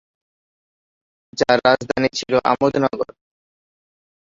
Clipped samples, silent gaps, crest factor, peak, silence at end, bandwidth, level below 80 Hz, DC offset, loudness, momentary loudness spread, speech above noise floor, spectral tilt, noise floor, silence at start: under 0.1%; none; 20 dB; -2 dBFS; 1.3 s; 7.8 kHz; -56 dBFS; under 0.1%; -18 LUFS; 12 LU; over 72 dB; -4.5 dB/octave; under -90 dBFS; 1.35 s